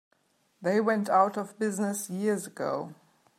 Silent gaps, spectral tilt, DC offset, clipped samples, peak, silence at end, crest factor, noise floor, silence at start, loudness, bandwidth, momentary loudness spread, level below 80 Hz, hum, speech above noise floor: none; -5.5 dB/octave; under 0.1%; under 0.1%; -10 dBFS; 0.45 s; 20 dB; -70 dBFS; 0.6 s; -29 LUFS; 15 kHz; 9 LU; -84 dBFS; none; 42 dB